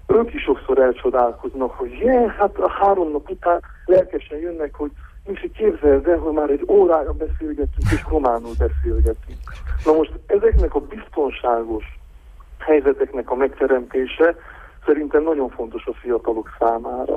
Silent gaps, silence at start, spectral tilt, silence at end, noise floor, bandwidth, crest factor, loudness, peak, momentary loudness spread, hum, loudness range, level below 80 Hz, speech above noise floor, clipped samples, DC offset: none; 0.05 s; -8 dB/octave; 0 s; -42 dBFS; 11.5 kHz; 16 dB; -20 LUFS; -4 dBFS; 12 LU; none; 3 LU; -30 dBFS; 23 dB; under 0.1%; under 0.1%